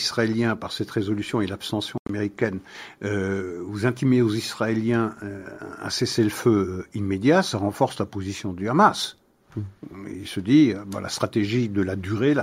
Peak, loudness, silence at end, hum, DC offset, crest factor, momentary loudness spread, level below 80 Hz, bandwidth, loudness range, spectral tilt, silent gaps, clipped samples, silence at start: -4 dBFS; -24 LUFS; 0 s; none; under 0.1%; 20 dB; 16 LU; -58 dBFS; 16 kHz; 4 LU; -5.5 dB/octave; 1.99-2.05 s; under 0.1%; 0 s